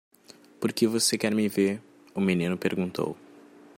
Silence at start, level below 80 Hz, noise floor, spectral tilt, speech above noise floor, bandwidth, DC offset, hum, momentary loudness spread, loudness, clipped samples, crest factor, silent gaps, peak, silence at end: 0.6 s; -70 dBFS; -54 dBFS; -4.5 dB/octave; 28 dB; 16.5 kHz; under 0.1%; none; 11 LU; -27 LUFS; under 0.1%; 18 dB; none; -10 dBFS; 0.6 s